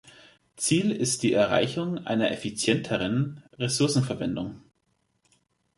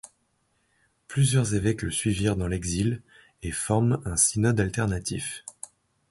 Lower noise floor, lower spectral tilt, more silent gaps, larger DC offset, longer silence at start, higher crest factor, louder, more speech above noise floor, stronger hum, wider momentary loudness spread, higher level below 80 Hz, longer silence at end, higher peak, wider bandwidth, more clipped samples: about the same, -73 dBFS vs -71 dBFS; about the same, -4.5 dB/octave vs -5 dB/octave; neither; neither; about the same, 0.05 s vs 0.05 s; about the same, 20 dB vs 18 dB; about the same, -26 LUFS vs -25 LUFS; about the same, 47 dB vs 46 dB; neither; second, 8 LU vs 15 LU; second, -60 dBFS vs -44 dBFS; first, 1.2 s vs 0.6 s; about the same, -6 dBFS vs -8 dBFS; about the same, 12 kHz vs 12 kHz; neither